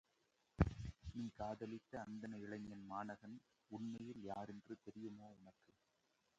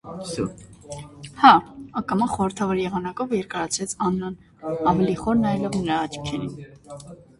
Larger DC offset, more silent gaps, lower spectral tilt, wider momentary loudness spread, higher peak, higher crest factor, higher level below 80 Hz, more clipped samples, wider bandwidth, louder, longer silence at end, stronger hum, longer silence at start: neither; neither; first, -8 dB/octave vs -5 dB/octave; second, 18 LU vs 21 LU; second, -22 dBFS vs 0 dBFS; first, 28 dB vs 22 dB; second, -58 dBFS vs -50 dBFS; neither; second, 8.8 kHz vs 11.5 kHz; second, -50 LUFS vs -23 LUFS; first, 0.9 s vs 0.25 s; neither; first, 0.6 s vs 0.05 s